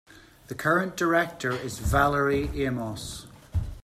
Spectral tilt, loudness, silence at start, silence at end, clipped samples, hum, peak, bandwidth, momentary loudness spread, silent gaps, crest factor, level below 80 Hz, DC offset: -5.5 dB/octave; -26 LUFS; 0.15 s; 0.05 s; under 0.1%; none; -8 dBFS; 15.5 kHz; 13 LU; none; 18 dB; -40 dBFS; under 0.1%